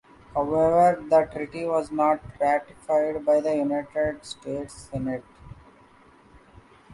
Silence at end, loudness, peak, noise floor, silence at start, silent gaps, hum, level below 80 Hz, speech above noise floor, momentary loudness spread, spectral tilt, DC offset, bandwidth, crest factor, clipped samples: 0 s; -25 LUFS; -8 dBFS; -54 dBFS; 0.35 s; none; none; -54 dBFS; 30 dB; 14 LU; -6.5 dB/octave; under 0.1%; 11.5 kHz; 16 dB; under 0.1%